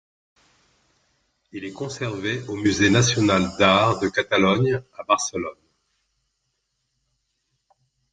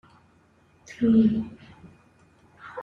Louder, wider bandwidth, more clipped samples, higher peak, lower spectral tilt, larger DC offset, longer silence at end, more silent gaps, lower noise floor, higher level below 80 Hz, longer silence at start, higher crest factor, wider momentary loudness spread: about the same, -21 LUFS vs -22 LUFS; first, 9.4 kHz vs 6.8 kHz; neither; first, -2 dBFS vs -10 dBFS; second, -4.5 dB/octave vs -8 dB/octave; neither; first, 2.6 s vs 0 s; neither; first, -75 dBFS vs -60 dBFS; about the same, -58 dBFS vs -58 dBFS; first, 1.55 s vs 0.9 s; about the same, 22 dB vs 18 dB; second, 15 LU vs 27 LU